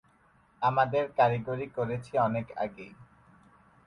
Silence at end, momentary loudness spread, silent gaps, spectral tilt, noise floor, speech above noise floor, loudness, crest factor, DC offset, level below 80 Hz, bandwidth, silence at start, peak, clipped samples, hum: 0.8 s; 11 LU; none; -8 dB/octave; -64 dBFS; 35 dB; -29 LUFS; 20 dB; under 0.1%; -64 dBFS; 11 kHz; 0.6 s; -12 dBFS; under 0.1%; none